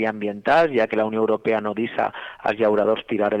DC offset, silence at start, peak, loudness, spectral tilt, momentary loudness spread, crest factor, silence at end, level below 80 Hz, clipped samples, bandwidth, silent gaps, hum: under 0.1%; 0 s; -8 dBFS; -21 LUFS; -7 dB/octave; 8 LU; 12 dB; 0 s; -60 dBFS; under 0.1%; 8.6 kHz; none; none